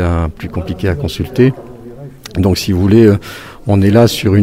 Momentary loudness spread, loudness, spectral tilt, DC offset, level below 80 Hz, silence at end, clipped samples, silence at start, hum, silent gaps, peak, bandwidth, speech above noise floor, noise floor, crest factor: 20 LU; -13 LUFS; -7 dB/octave; under 0.1%; -30 dBFS; 0 s; 0.1%; 0 s; none; none; 0 dBFS; 16 kHz; 20 dB; -31 dBFS; 12 dB